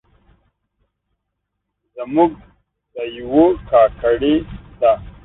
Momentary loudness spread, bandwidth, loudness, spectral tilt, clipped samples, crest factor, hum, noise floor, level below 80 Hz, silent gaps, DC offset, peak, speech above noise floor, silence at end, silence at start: 16 LU; 4 kHz; -16 LUFS; -11 dB/octave; under 0.1%; 18 dB; none; -76 dBFS; -42 dBFS; none; under 0.1%; -2 dBFS; 60 dB; 0.15 s; 1.95 s